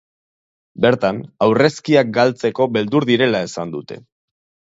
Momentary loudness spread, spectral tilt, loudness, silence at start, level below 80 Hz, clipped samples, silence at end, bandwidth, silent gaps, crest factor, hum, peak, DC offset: 13 LU; -6 dB/octave; -17 LUFS; 0.8 s; -58 dBFS; under 0.1%; 0.65 s; 8 kHz; none; 18 dB; none; 0 dBFS; under 0.1%